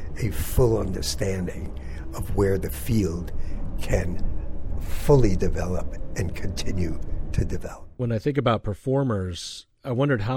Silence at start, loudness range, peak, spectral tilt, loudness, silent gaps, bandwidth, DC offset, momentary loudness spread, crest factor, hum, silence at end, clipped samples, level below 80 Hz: 0 s; 2 LU; -4 dBFS; -6.5 dB/octave; -27 LUFS; none; 16.5 kHz; under 0.1%; 13 LU; 18 dB; none; 0 s; under 0.1%; -30 dBFS